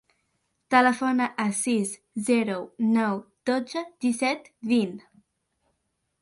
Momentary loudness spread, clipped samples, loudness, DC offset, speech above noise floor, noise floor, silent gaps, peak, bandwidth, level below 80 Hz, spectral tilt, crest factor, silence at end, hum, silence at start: 11 LU; under 0.1%; -25 LUFS; under 0.1%; 52 dB; -77 dBFS; none; -8 dBFS; 11.5 kHz; -72 dBFS; -4 dB/octave; 20 dB; 1.25 s; none; 0.7 s